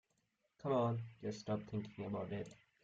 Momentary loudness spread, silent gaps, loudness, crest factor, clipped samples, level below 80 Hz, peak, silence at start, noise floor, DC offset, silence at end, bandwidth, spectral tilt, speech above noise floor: 11 LU; none; -42 LUFS; 18 dB; under 0.1%; -74 dBFS; -24 dBFS; 0.65 s; -83 dBFS; under 0.1%; 0.3 s; 8 kHz; -7.5 dB/octave; 42 dB